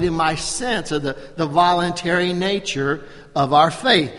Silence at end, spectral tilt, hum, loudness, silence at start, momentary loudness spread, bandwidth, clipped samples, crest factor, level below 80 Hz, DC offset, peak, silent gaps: 0 s; -4 dB/octave; none; -19 LUFS; 0 s; 9 LU; 11.5 kHz; under 0.1%; 20 dB; -44 dBFS; under 0.1%; 0 dBFS; none